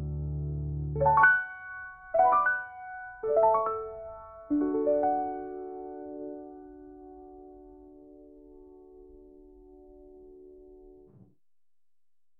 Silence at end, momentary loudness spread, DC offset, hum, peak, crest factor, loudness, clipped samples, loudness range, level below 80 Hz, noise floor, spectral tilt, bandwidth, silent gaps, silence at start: 1.45 s; 26 LU; under 0.1%; none; -8 dBFS; 22 dB; -27 LUFS; under 0.1%; 21 LU; -48 dBFS; under -90 dBFS; -7 dB/octave; 3.2 kHz; none; 0 s